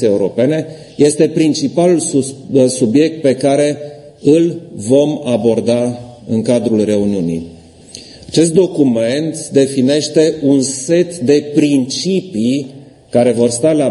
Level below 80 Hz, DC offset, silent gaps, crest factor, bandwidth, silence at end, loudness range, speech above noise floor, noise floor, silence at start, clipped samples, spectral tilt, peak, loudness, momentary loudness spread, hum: -54 dBFS; under 0.1%; none; 14 dB; 11.5 kHz; 0 s; 2 LU; 23 dB; -36 dBFS; 0 s; under 0.1%; -5.5 dB/octave; 0 dBFS; -13 LUFS; 9 LU; none